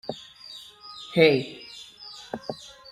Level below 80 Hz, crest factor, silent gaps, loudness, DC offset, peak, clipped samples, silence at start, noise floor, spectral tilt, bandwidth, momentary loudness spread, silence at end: -66 dBFS; 24 dB; none; -23 LUFS; under 0.1%; -4 dBFS; under 0.1%; 0.1 s; -46 dBFS; -5.5 dB/octave; 14 kHz; 22 LU; 0.35 s